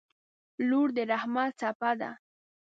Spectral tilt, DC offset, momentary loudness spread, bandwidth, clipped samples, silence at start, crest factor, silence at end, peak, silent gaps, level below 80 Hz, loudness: -5.5 dB/octave; under 0.1%; 9 LU; 7.8 kHz; under 0.1%; 0.6 s; 18 dB; 0.65 s; -14 dBFS; 1.75-1.80 s; -84 dBFS; -30 LUFS